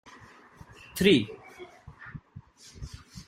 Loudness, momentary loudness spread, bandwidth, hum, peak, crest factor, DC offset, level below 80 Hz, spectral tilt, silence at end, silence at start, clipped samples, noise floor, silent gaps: -25 LUFS; 27 LU; 16 kHz; none; -8 dBFS; 24 dB; under 0.1%; -54 dBFS; -5 dB/octave; 0.05 s; 0.95 s; under 0.1%; -53 dBFS; none